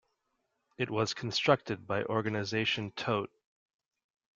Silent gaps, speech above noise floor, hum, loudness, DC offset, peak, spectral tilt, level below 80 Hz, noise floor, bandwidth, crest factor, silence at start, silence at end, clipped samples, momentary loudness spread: none; 49 dB; none; -32 LUFS; under 0.1%; -10 dBFS; -5 dB/octave; -70 dBFS; -81 dBFS; 7.6 kHz; 24 dB; 0.8 s; 1.1 s; under 0.1%; 7 LU